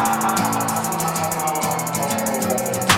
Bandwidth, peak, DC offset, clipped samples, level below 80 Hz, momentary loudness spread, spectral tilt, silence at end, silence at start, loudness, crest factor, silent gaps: 17.5 kHz; -4 dBFS; under 0.1%; under 0.1%; -52 dBFS; 3 LU; -3 dB/octave; 0 s; 0 s; -21 LUFS; 18 dB; none